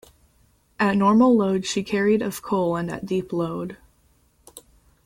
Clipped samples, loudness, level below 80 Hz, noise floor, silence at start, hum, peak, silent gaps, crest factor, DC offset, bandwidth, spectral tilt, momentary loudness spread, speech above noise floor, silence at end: under 0.1%; -22 LUFS; -56 dBFS; -61 dBFS; 0.8 s; none; -6 dBFS; none; 16 dB; under 0.1%; 16 kHz; -6 dB/octave; 11 LU; 40 dB; 0.45 s